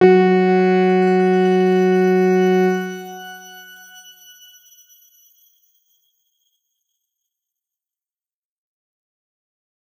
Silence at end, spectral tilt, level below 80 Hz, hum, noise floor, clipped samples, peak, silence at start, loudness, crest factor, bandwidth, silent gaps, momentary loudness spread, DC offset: 6.4 s; -7.5 dB/octave; -74 dBFS; none; under -90 dBFS; under 0.1%; -2 dBFS; 0 s; -15 LUFS; 18 dB; 12.5 kHz; none; 21 LU; under 0.1%